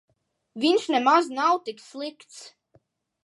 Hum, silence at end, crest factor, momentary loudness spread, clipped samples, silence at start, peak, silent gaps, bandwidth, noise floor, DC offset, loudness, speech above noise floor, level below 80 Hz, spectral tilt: none; 0.75 s; 20 dB; 24 LU; under 0.1%; 0.55 s; -6 dBFS; none; 11.5 kHz; -64 dBFS; under 0.1%; -22 LUFS; 41 dB; -84 dBFS; -3 dB/octave